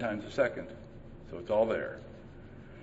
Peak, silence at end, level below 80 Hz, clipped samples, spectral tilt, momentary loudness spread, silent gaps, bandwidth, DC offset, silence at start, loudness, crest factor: -16 dBFS; 0 s; -56 dBFS; under 0.1%; -6.5 dB/octave; 21 LU; none; 8 kHz; under 0.1%; 0 s; -33 LUFS; 20 dB